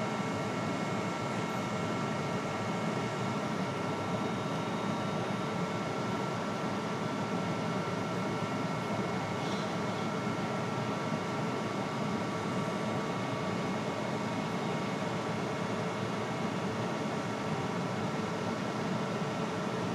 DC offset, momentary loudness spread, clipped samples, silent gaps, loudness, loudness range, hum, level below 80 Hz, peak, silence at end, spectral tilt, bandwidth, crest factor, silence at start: under 0.1%; 1 LU; under 0.1%; none; -34 LUFS; 0 LU; none; -66 dBFS; -20 dBFS; 0 s; -5.5 dB/octave; 14.5 kHz; 12 dB; 0 s